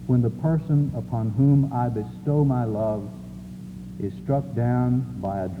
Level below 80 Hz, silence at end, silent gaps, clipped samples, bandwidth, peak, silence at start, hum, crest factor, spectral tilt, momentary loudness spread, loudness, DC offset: -48 dBFS; 0 s; none; under 0.1%; 4.7 kHz; -10 dBFS; 0 s; none; 14 dB; -10.5 dB/octave; 17 LU; -24 LUFS; under 0.1%